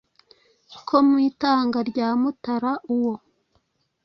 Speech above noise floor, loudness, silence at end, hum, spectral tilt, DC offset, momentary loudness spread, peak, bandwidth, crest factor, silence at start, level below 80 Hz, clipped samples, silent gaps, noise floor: 48 dB; -22 LUFS; 0.85 s; none; -6.5 dB/octave; under 0.1%; 8 LU; -4 dBFS; 6.2 kHz; 20 dB; 0.7 s; -66 dBFS; under 0.1%; none; -69 dBFS